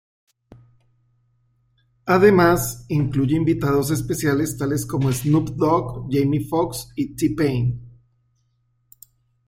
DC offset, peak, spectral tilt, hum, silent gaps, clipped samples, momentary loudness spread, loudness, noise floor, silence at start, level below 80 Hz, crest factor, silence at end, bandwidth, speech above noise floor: under 0.1%; -2 dBFS; -6.5 dB/octave; none; none; under 0.1%; 8 LU; -20 LUFS; -66 dBFS; 2.05 s; -46 dBFS; 18 dB; 1.6 s; 16.5 kHz; 47 dB